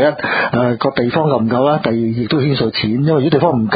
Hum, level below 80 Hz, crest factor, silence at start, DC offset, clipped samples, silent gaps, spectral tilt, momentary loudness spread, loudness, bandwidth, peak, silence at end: none; -46 dBFS; 14 dB; 0 s; under 0.1%; under 0.1%; none; -11.5 dB/octave; 3 LU; -15 LUFS; 5 kHz; 0 dBFS; 0 s